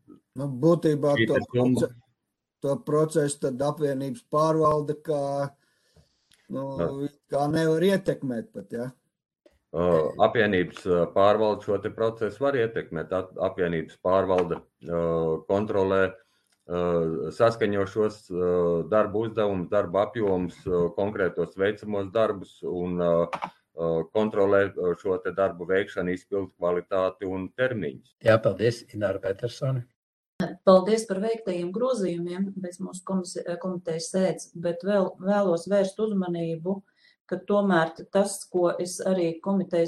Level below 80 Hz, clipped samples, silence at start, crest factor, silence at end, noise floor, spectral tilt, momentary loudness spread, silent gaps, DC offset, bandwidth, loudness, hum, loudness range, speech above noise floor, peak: -60 dBFS; under 0.1%; 0.1 s; 20 dB; 0 s; -81 dBFS; -6.5 dB/octave; 10 LU; 29.96-30.39 s, 37.20-37.25 s; under 0.1%; 12.5 kHz; -26 LUFS; none; 3 LU; 56 dB; -6 dBFS